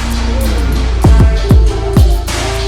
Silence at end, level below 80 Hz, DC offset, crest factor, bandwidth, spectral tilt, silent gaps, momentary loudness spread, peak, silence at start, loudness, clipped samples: 0 s; -12 dBFS; under 0.1%; 10 dB; 15.5 kHz; -6 dB/octave; none; 6 LU; 0 dBFS; 0 s; -12 LUFS; under 0.1%